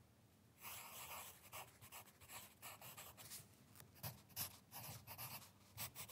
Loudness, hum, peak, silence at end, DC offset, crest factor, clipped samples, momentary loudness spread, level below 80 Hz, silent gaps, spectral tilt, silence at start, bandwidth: -54 LUFS; none; -34 dBFS; 0 s; under 0.1%; 24 dB; under 0.1%; 9 LU; -82 dBFS; none; -2 dB/octave; 0 s; 16 kHz